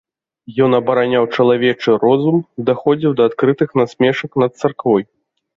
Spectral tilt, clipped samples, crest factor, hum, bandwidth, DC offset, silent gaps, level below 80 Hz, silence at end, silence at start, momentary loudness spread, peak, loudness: -7.5 dB/octave; under 0.1%; 14 dB; none; 7.6 kHz; under 0.1%; none; -58 dBFS; 0.55 s; 0.5 s; 5 LU; -2 dBFS; -15 LUFS